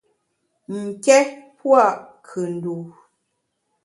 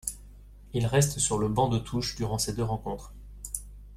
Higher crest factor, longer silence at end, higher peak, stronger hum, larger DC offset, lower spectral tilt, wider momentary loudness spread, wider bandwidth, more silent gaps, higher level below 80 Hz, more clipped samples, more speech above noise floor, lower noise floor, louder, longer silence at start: about the same, 22 dB vs 18 dB; first, 0.95 s vs 0 s; first, 0 dBFS vs -12 dBFS; second, none vs 50 Hz at -45 dBFS; neither; about the same, -4.5 dB/octave vs -4.5 dB/octave; first, 18 LU vs 15 LU; second, 11.5 kHz vs 16 kHz; neither; second, -74 dBFS vs -46 dBFS; neither; first, 55 dB vs 21 dB; first, -74 dBFS vs -49 dBFS; first, -19 LUFS vs -29 LUFS; first, 0.7 s vs 0.05 s